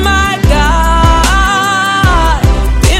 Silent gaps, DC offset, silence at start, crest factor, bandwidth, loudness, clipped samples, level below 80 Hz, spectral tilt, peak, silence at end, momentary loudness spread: none; under 0.1%; 0 s; 8 dB; 15.5 kHz; -9 LUFS; 0.3%; -12 dBFS; -4.5 dB/octave; 0 dBFS; 0 s; 2 LU